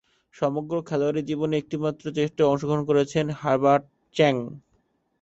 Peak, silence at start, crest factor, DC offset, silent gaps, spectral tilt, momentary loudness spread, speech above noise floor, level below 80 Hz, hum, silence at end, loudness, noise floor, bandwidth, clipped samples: -6 dBFS; 0.4 s; 18 dB; under 0.1%; none; -6.5 dB/octave; 7 LU; 45 dB; -62 dBFS; none; 0.6 s; -24 LUFS; -69 dBFS; 8 kHz; under 0.1%